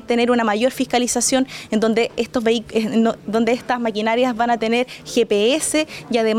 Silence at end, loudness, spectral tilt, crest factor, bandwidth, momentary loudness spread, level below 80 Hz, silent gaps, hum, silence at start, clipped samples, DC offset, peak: 0 s; -19 LUFS; -3.5 dB/octave; 12 dB; 16 kHz; 4 LU; -54 dBFS; none; none; 0 s; under 0.1%; under 0.1%; -6 dBFS